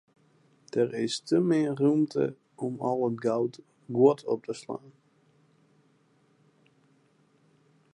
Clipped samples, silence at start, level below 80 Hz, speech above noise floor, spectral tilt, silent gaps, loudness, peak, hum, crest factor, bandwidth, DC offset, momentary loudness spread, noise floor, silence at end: under 0.1%; 0.75 s; -80 dBFS; 39 dB; -6.5 dB/octave; none; -28 LUFS; -10 dBFS; none; 20 dB; 11.5 kHz; under 0.1%; 13 LU; -66 dBFS; 3.05 s